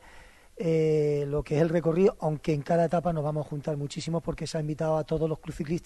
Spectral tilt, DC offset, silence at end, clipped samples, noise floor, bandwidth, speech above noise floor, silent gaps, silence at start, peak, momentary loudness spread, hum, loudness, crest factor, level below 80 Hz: -7.5 dB/octave; under 0.1%; 0 s; under 0.1%; -51 dBFS; 12 kHz; 24 dB; none; 0.05 s; -10 dBFS; 8 LU; none; -28 LUFS; 18 dB; -50 dBFS